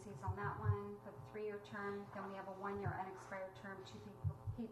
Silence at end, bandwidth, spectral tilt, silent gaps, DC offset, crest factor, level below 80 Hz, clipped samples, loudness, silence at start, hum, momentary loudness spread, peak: 0 s; 13 kHz; -7.5 dB/octave; none; under 0.1%; 20 dB; -66 dBFS; under 0.1%; -47 LUFS; 0 s; 60 Hz at -65 dBFS; 10 LU; -26 dBFS